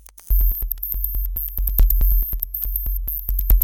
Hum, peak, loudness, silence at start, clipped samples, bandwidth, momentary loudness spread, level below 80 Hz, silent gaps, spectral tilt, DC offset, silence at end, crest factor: none; -4 dBFS; -22 LUFS; 0.3 s; under 0.1%; over 20 kHz; 6 LU; -20 dBFS; none; -6 dB/octave; under 0.1%; 0 s; 16 dB